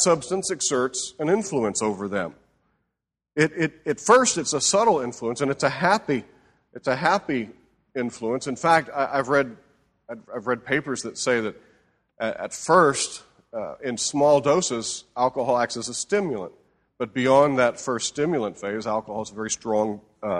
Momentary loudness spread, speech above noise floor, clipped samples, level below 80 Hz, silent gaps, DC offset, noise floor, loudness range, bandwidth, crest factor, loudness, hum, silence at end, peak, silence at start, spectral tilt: 13 LU; 59 dB; under 0.1%; -62 dBFS; none; under 0.1%; -83 dBFS; 4 LU; 12 kHz; 20 dB; -23 LUFS; none; 0 s; -4 dBFS; 0 s; -3.5 dB/octave